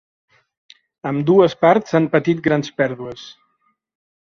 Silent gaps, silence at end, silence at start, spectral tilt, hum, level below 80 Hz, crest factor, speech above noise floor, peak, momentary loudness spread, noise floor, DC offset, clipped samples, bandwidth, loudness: none; 0.9 s; 1.05 s; -7 dB/octave; none; -60 dBFS; 18 dB; 50 dB; -2 dBFS; 16 LU; -66 dBFS; under 0.1%; under 0.1%; 7 kHz; -17 LUFS